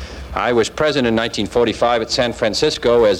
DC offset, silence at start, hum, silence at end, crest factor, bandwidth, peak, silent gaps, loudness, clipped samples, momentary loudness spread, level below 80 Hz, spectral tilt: under 0.1%; 0 s; none; 0 s; 14 dB; 13 kHz; -4 dBFS; none; -17 LUFS; under 0.1%; 4 LU; -38 dBFS; -4 dB/octave